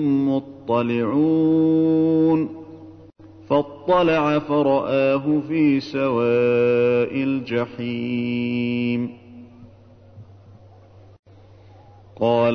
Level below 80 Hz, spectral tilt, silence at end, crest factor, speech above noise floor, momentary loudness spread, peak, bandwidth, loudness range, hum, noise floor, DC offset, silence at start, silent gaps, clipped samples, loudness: -58 dBFS; -8.5 dB/octave; 0 s; 14 dB; 28 dB; 8 LU; -6 dBFS; 6.2 kHz; 9 LU; none; -48 dBFS; under 0.1%; 0 s; 11.19-11.23 s; under 0.1%; -20 LUFS